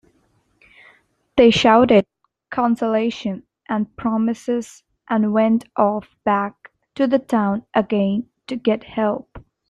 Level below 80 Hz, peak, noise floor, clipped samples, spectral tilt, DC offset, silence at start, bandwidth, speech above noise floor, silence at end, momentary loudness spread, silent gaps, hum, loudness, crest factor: -54 dBFS; -2 dBFS; -63 dBFS; under 0.1%; -6 dB/octave; under 0.1%; 1.35 s; 10.5 kHz; 45 dB; 0.3 s; 15 LU; none; none; -19 LUFS; 18 dB